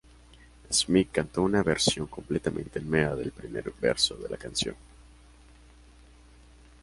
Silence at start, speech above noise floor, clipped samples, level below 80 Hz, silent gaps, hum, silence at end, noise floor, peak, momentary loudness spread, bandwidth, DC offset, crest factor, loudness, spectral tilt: 0.7 s; 26 dB; under 0.1%; -50 dBFS; none; none; 1.8 s; -54 dBFS; -8 dBFS; 11 LU; 11.5 kHz; under 0.1%; 22 dB; -28 LUFS; -3.5 dB/octave